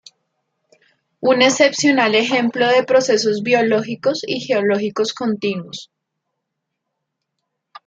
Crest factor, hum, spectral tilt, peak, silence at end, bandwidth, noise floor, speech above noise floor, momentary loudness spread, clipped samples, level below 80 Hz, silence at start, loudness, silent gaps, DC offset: 18 dB; none; -3.5 dB/octave; 0 dBFS; 2.05 s; 9 kHz; -77 dBFS; 61 dB; 9 LU; under 0.1%; -68 dBFS; 1.2 s; -16 LUFS; none; under 0.1%